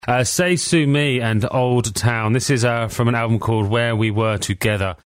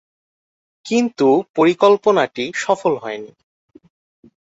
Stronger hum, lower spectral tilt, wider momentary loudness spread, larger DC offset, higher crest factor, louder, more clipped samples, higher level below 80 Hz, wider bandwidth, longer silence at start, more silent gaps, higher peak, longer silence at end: neither; about the same, -5 dB/octave vs -5 dB/octave; second, 3 LU vs 13 LU; neither; second, 12 dB vs 18 dB; about the same, -18 LUFS vs -17 LUFS; neither; first, -46 dBFS vs -66 dBFS; first, 16 kHz vs 8 kHz; second, 0.05 s vs 0.85 s; second, none vs 1.49-1.54 s; second, -6 dBFS vs -2 dBFS; second, 0.1 s vs 1.3 s